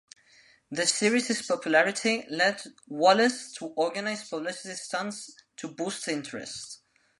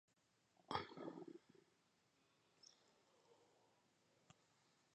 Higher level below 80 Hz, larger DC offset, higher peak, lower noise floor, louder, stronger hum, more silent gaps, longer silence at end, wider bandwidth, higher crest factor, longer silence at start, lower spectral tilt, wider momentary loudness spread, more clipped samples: first, -78 dBFS vs -84 dBFS; neither; first, -8 dBFS vs -28 dBFS; second, -60 dBFS vs -82 dBFS; first, -27 LUFS vs -52 LUFS; neither; neither; second, 0.45 s vs 0.6 s; first, 11.5 kHz vs 8.4 kHz; second, 20 dB vs 30 dB; about the same, 0.7 s vs 0.7 s; second, -2.5 dB/octave vs -4.5 dB/octave; about the same, 17 LU vs 19 LU; neither